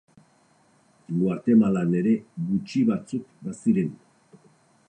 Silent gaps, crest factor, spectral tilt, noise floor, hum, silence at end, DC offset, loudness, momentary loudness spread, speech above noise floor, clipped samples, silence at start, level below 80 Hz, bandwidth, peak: none; 18 dB; -8.5 dB/octave; -61 dBFS; none; 0.95 s; under 0.1%; -24 LUFS; 12 LU; 38 dB; under 0.1%; 1.1 s; -66 dBFS; 9.6 kHz; -8 dBFS